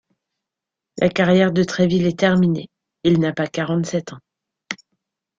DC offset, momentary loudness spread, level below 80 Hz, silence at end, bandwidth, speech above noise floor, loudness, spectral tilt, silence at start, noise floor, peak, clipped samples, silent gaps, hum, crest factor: under 0.1%; 17 LU; -54 dBFS; 0.65 s; 7.6 kHz; 68 dB; -19 LUFS; -6.5 dB/octave; 0.95 s; -85 dBFS; -2 dBFS; under 0.1%; none; none; 18 dB